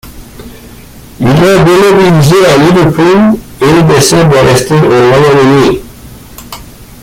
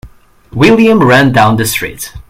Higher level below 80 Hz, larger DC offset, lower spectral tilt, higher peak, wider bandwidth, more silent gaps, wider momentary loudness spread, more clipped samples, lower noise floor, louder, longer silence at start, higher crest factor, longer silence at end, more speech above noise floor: about the same, -32 dBFS vs -36 dBFS; neither; about the same, -5.5 dB/octave vs -5.5 dB/octave; about the same, 0 dBFS vs 0 dBFS; about the same, 16.5 kHz vs 16.5 kHz; neither; second, 8 LU vs 12 LU; second, 0.1% vs 0.7%; second, -30 dBFS vs -36 dBFS; first, -5 LUFS vs -8 LUFS; about the same, 0.05 s vs 0.05 s; about the same, 6 dB vs 10 dB; about the same, 0.2 s vs 0.1 s; about the same, 26 dB vs 28 dB